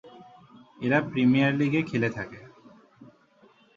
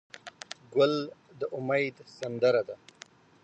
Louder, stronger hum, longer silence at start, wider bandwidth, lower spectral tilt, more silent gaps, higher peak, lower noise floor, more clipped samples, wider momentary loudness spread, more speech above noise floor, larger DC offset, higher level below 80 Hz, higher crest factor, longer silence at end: first, -25 LUFS vs -29 LUFS; neither; about the same, 0.05 s vs 0.15 s; second, 7.2 kHz vs 8.8 kHz; first, -7.5 dB/octave vs -5.5 dB/octave; neither; first, -8 dBFS vs -12 dBFS; first, -59 dBFS vs -55 dBFS; neither; about the same, 16 LU vs 18 LU; first, 35 dB vs 26 dB; neither; first, -64 dBFS vs -78 dBFS; about the same, 20 dB vs 18 dB; about the same, 0.7 s vs 0.7 s